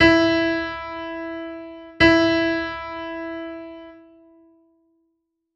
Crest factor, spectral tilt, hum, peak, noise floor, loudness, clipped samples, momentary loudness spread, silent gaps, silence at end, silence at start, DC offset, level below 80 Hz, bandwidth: 22 dB; -5.5 dB/octave; none; 0 dBFS; -74 dBFS; -21 LUFS; under 0.1%; 22 LU; none; 1.55 s; 0 s; under 0.1%; -46 dBFS; 7.6 kHz